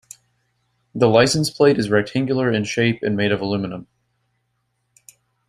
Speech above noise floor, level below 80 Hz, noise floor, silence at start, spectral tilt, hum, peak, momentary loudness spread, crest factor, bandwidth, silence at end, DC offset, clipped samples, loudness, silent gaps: 53 dB; -56 dBFS; -71 dBFS; 0.95 s; -5 dB/octave; none; -2 dBFS; 10 LU; 20 dB; 15 kHz; 1.65 s; under 0.1%; under 0.1%; -19 LUFS; none